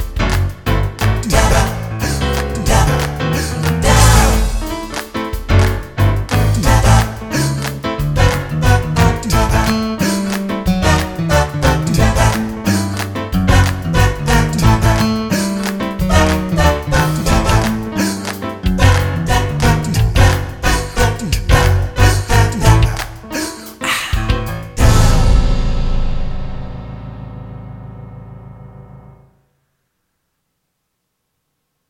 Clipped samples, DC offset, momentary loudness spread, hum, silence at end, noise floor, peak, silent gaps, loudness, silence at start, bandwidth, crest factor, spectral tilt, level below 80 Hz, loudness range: under 0.1%; under 0.1%; 11 LU; none; 2.8 s; -71 dBFS; 0 dBFS; none; -15 LUFS; 0 s; 19.5 kHz; 14 dB; -5 dB/octave; -20 dBFS; 4 LU